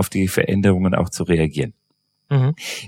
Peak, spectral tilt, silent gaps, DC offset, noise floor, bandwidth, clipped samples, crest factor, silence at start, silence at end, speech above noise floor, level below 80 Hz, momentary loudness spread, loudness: -2 dBFS; -6 dB/octave; none; under 0.1%; -68 dBFS; 17 kHz; under 0.1%; 18 dB; 0 s; 0 s; 50 dB; -42 dBFS; 5 LU; -19 LUFS